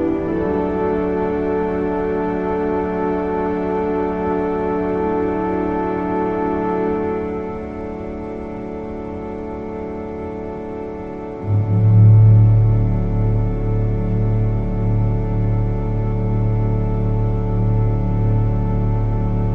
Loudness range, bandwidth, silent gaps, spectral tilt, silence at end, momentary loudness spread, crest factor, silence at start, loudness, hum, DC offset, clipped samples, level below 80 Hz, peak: 11 LU; 3.4 kHz; none; -11 dB/octave; 0 s; 12 LU; 14 dB; 0 s; -19 LUFS; none; under 0.1%; under 0.1%; -28 dBFS; -2 dBFS